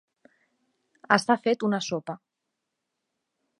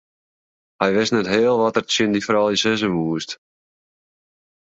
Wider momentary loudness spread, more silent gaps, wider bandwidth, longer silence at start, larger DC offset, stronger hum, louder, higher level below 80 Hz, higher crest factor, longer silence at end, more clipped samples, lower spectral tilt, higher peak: first, 16 LU vs 8 LU; neither; first, 11.5 kHz vs 8 kHz; first, 1.1 s vs 0.8 s; neither; neither; second, -25 LUFS vs -19 LUFS; second, -76 dBFS vs -58 dBFS; first, 26 dB vs 20 dB; about the same, 1.45 s vs 1.35 s; neither; about the same, -4.5 dB/octave vs -4 dB/octave; about the same, -4 dBFS vs -2 dBFS